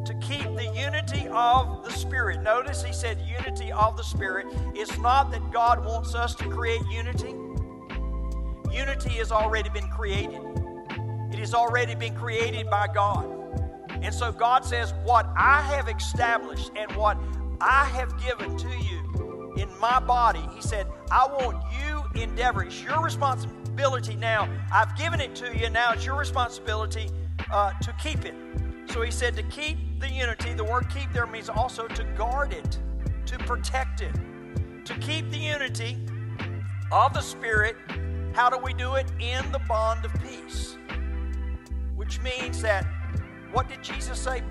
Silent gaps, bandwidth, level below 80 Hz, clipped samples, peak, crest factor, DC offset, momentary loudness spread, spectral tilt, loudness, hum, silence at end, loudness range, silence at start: none; 12.5 kHz; -34 dBFS; under 0.1%; -8 dBFS; 20 dB; under 0.1%; 11 LU; -5 dB/octave; -27 LUFS; none; 0 s; 6 LU; 0 s